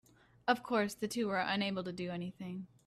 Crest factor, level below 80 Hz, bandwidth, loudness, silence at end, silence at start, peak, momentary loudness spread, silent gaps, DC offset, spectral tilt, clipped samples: 22 dB; -72 dBFS; 14.5 kHz; -36 LUFS; 0.2 s; 0.45 s; -16 dBFS; 10 LU; none; under 0.1%; -5 dB/octave; under 0.1%